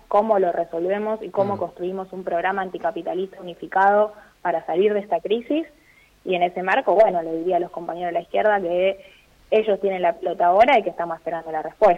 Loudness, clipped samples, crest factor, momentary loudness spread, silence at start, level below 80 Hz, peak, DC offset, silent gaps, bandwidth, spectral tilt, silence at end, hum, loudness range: -22 LUFS; under 0.1%; 16 dB; 12 LU; 0.1 s; -60 dBFS; -6 dBFS; under 0.1%; none; 7.6 kHz; -6.5 dB/octave; 0 s; none; 3 LU